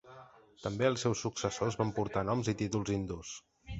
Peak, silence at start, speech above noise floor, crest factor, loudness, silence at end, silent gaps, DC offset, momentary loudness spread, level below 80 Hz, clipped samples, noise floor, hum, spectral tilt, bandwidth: -14 dBFS; 0.05 s; 22 dB; 22 dB; -34 LUFS; 0 s; none; under 0.1%; 12 LU; -56 dBFS; under 0.1%; -56 dBFS; none; -5.5 dB/octave; 8.2 kHz